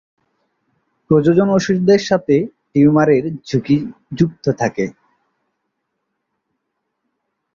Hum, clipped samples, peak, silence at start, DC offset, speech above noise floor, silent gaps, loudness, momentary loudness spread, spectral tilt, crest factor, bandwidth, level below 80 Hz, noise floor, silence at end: none; under 0.1%; -2 dBFS; 1.1 s; under 0.1%; 59 dB; none; -16 LUFS; 9 LU; -7 dB/octave; 16 dB; 7.4 kHz; -52 dBFS; -74 dBFS; 2.65 s